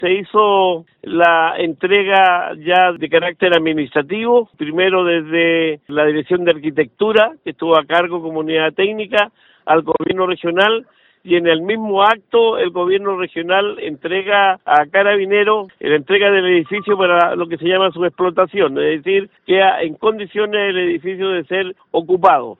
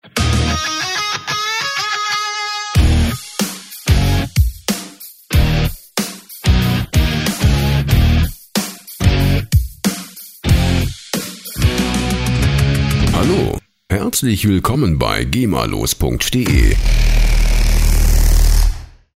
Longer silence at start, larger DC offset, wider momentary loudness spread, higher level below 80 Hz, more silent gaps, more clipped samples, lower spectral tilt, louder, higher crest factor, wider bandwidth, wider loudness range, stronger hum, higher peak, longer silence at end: second, 0 s vs 0.15 s; neither; about the same, 7 LU vs 8 LU; second, -60 dBFS vs -18 dBFS; neither; neither; first, -7 dB/octave vs -5 dB/octave; about the same, -15 LUFS vs -16 LUFS; about the same, 16 dB vs 14 dB; second, 4.1 kHz vs 16.5 kHz; about the same, 3 LU vs 2 LU; neither; about the same, 0 dBFS vs 0 dBFS; second, 0.05 s vs 0.3 s